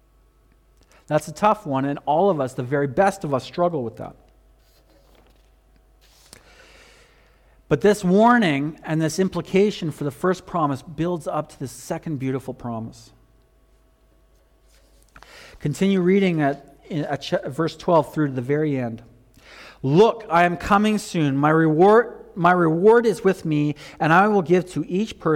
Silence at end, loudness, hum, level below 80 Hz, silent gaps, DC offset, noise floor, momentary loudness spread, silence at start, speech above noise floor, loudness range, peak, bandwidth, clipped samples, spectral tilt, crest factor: 0 s; -21 LUFS; none; -54 dBFS; none; under 0.1%; -57 dBFS; 14 LU; 1.1 s; 37 dB; 14 LU; -6 dBFS; 16.5 kHz; under 0.1%; -6.5 dB/octave; 16 dB